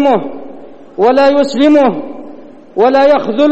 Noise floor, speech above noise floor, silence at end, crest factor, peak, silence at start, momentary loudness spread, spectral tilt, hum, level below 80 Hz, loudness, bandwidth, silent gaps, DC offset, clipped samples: -33 dBFS; 24 dB; 0 s; 10 dB; 0 dBFS; 0 s; 19 LU; -6 dB/octave; none; -52 dBFS; -10 LUFS; 8.4 kHz; none; 3%; under 0.1%